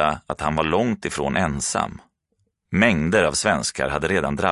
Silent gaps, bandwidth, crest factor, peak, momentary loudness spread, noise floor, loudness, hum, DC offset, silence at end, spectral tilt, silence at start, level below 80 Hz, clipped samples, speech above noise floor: none; 11.5 kHz; 20 dB; -2 dBFS; 7 LU; -71 dBFS; -21 LUFS; none; under 0.1%; 0 s; -4 dB/octave; 0 s; -40 dBFS; under 0.1%; 50 dB